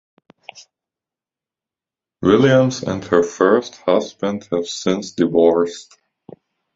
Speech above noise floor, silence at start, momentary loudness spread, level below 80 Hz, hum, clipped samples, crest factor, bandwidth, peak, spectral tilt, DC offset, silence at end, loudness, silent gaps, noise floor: 72 dB; 0.55 s; 10 LU; -54 dBFS; none; under 0.1%; 18 dB; 7.8 kHz; 0 dBFS; -6 dB/octave; under 0.1%; 0.95 s; -17 LUFS; none; -89 dBFS